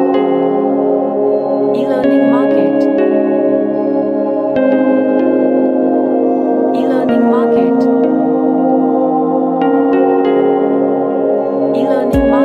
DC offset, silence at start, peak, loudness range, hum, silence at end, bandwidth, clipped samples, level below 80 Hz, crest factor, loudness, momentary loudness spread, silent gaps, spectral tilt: under 0.1%; 0 s; 0 dBFS; 1 LU; none; 0 s; 5.2 kHz; under 0.1%; -40 dBFS; 12 dB; -12 LUFS; 3 LU; none; -8.5 dB/octave